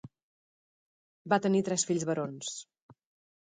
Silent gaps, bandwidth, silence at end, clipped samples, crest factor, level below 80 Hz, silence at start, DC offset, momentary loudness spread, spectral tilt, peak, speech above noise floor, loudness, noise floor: 0.23-1.25 s, 2.82-2.89 s; 9.6 kHz; 0.5 s; under 0.1%; 22 dB; -76 dBFS; 0.05 s; under 0.1%; 12 LU; -4.5 dB/octave; -12 dBFS; over 60 dB; -30 LUFS; under -90 dBFS